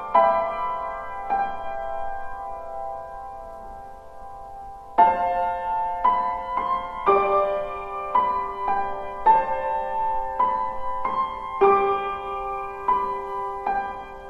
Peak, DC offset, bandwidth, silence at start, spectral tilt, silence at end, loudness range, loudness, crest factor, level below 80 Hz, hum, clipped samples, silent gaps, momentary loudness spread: -4 dBFS; under 0.1%; 8.6 kHz; 0 s; -6 dB/octave; 0 s; 9 LU; -24 LUFS; 20 dB; -46 dBFS; none; under 0.1%; none; 18 LU